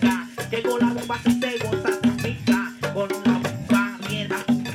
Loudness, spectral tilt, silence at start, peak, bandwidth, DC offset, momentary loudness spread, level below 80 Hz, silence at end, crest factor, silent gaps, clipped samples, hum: -23 LUFS; -5.5 dB/octave; 0 s; -6 dBFS; 16 kHz; under 0.1%; 5 LU; -52 dBFS; 0 s; 16 dB; none; under 0.1%; none